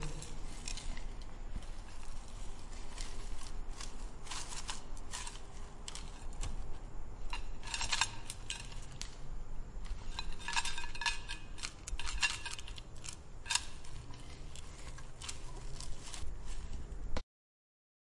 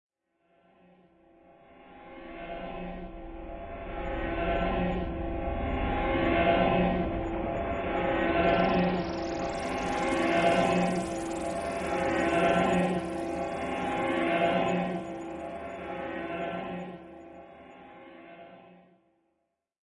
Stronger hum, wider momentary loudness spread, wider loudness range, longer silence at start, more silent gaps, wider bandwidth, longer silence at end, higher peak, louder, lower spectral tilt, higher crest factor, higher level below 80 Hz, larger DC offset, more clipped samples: neither; second, 15 LU vs 21 LU; second, 9 LU vs 14 LU; second, 0 s vs 1.7 s; neither; about the same, 11.5 kHz vs 11.5 kHz; about the same, 1 s vs 1.1 s; about the same, -14 dBFS vs -12 dBFS; second, -43 LUFS vs -29 LUFS; second, -1.5 dB/octave vs -6 dB/octave; first, 24 dB vs 18 dB; about the same, -44 dBFS vs -44 dBFS; neither; neither